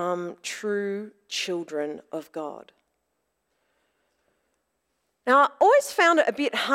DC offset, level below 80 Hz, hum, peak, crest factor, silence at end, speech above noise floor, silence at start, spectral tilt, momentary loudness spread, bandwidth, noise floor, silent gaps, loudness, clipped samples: under 0.1%; -78 dBFS; none; -8 dBFS; 18 dB; 0 s; 53 dB; 0 s; -3 dB/octave; 17 LU; 16 kHz; -77 dBFS; none; -24 LUFS; under 0.1%